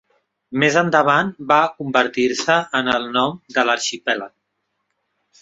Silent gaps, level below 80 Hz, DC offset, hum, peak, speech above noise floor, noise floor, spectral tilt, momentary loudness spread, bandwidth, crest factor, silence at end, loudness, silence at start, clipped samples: none; -62 dBFS; under 0.1%; none; -2 dBFS; 55 dB; -74 dBFS; -3.5 dB/octave; 8 LU; 7.8 kHz; 18 dB; 1.15 s; -18 LUFS; 0.5 s; under 0.1%